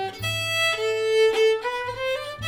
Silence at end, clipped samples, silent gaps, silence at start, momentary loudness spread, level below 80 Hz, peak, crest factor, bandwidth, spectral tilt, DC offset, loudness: 0 s; under 0.1%; none; 0 s; 8 LU; -54 dBFS; -10 dBFS; 14 dB; 17.5 kHz; -2.5 dB/octave; under 0.1%; -23 LUFS